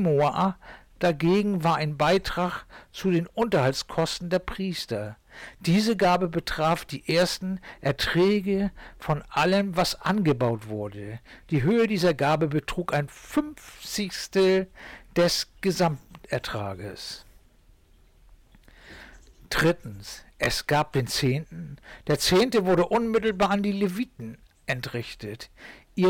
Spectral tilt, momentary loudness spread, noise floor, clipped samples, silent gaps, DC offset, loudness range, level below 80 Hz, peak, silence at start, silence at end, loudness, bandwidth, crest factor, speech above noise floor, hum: -5.5 dB/octave; 16 LU; -57 dBFS; under 0.1%; none; under 0.1%; 6 LU; -48 dBFS; -14 dBFS; 0 s; 0 s; -25 LUFS; 18 kHz; 12 dB; 32 dB; none